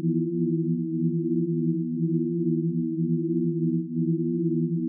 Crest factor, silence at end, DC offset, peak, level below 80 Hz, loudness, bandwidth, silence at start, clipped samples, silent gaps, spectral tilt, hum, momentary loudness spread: 10 dB; 0 s; under 0.1%; -14 dBFS; under -90 dBFS; -26 LUFS; 0.4 kHz; 0 s; under 0.1%; none; -18 dB/octave; none; 1 LU